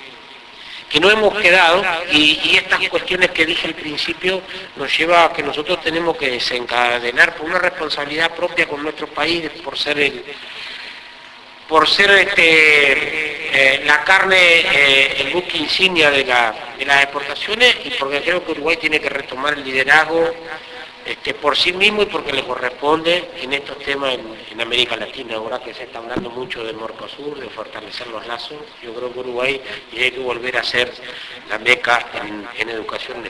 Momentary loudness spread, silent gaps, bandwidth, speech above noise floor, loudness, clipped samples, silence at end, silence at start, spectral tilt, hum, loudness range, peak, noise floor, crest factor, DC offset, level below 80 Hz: 19 LU; none; 11 kHz; 22 dB; -15 LUFS; under 0.1%; 0 s; 0 s; -2.5 dB/octave; none; 11 LU; 0 dBFS; -39 dBFS; 18 dB; under 0.1%; -50 dBFS